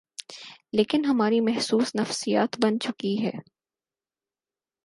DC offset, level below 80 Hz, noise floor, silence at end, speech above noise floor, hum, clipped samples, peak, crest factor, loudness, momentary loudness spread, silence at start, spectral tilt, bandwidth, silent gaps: under 0.1%; -70 dBFS; under -90 dBFS; 1.45 s; over 66 dB; none; under 0.1%; -8 dBFS; 18 dB; -25 LUFS; 17 LU; 0.2 s; -4.5 dB/octave; 11.5 kHz; none